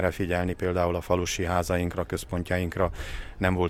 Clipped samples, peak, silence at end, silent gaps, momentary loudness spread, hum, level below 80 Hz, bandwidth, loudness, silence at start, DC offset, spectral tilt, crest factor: under 0.1%; -8 dBFS; 0 s; none; 5 LU; none; -40 dBFS; 16 kHz; -28 LUFS; 0 s; under 0.1%; -5.5 dB/octave; 20 dB